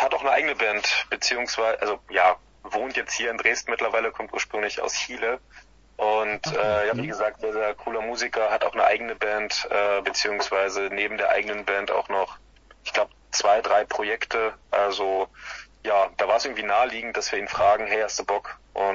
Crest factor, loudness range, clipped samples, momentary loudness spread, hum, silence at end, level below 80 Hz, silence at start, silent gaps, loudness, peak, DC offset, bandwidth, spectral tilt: 20 dB; 2 LU; under 0.1%; 7 LU; none; 0 s; -56 dBFS; 0 s; none; -24 LUFS; -4 dBFS; under 0.1%; 7.8 kHz; -2 dB/octave